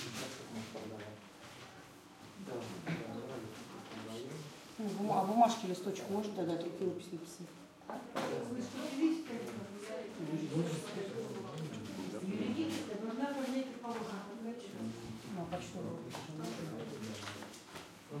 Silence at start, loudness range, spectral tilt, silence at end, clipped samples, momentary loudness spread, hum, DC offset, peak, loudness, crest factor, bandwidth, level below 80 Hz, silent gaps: 0 s; 10 LU; -5.5 dB/octave; 0 s; under 0.1%; 14 LU; none; under 0.1%; -16 dBFS; -40 LUFS; 24 dB; 16.5 kHz; -76 dBFS; none